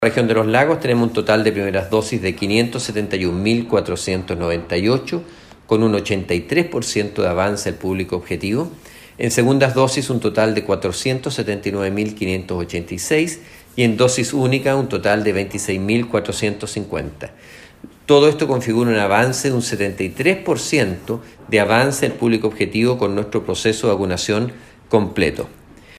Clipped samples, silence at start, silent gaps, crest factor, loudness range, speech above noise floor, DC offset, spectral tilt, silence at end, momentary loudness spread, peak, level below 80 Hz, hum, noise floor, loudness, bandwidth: under 0.1%; 0 s; none; 18 dB; 3 LU; 23 dB; under 0.1%; -5 dB/octave; 0.05 s; 9 LU; 0 dBFS; -46 dBFS; none; -41 dBFS; -18 LUFS; 15.5 kHz